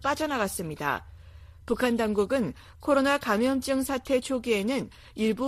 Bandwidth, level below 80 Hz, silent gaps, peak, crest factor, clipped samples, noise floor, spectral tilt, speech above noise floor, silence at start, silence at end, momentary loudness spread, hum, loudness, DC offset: 15.5 kHz; -52 dBFS; none; -10 dBFS; 18 dB; under 0.1%; -48 dBFS; -4.5 dB/octave; 21 dB; 0 s; 0 s; 9 LU; none; -27 LUFS; under 0.1%